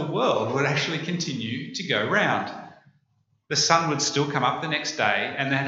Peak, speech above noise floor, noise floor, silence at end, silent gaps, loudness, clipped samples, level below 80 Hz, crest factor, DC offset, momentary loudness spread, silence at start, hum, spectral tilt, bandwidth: -2 dBFS; 44 dB; -69 dBFS; 0 s; none; -24 LUFS; under 0.1%; -72 dBFS; 24 dB; under 0.1%; 9 LU; 0 s; none; -3.5 dB/octave; 8 kHz